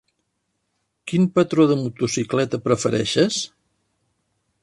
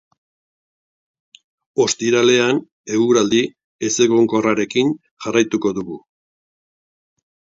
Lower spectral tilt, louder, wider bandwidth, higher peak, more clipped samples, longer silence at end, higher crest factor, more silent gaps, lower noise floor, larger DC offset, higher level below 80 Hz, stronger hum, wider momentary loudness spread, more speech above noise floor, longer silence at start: about the same, -5 dB/octave vs -4 dB/octave; second, -20 LUFS vs -17 LUFS; first, 11.5 kHz vs 7.8 kHz; second, -4 dBFS vs 0 dBFS; neither; second, 1.15 s vs 1.6 s; about the same, 18 dB vs 18 dB; second, none vs 2.72-2.84 s, 3.64-3.79 s, 5.11-5.17 s; second, -74 dBFS vs under -90 dBFS; neither; about the same, -58 dBFS vs -62 dBFS; neither; second, 8 LU vs 12 LU; second, 54 dB vs over 73 dB; second, 1.05 s vs 1.75 s